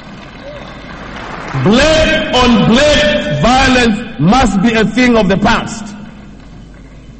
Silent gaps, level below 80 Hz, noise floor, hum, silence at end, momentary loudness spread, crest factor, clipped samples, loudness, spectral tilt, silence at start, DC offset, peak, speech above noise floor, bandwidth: none; -26 dBFS; -33 dBFS; none; 0 s; 20 LU; 12 dB; under 0.1%; -10 LUFS; -5 dB/octave; 0 s; under 0.1%; 0 dBFS; 24 dB; 8.8 kHz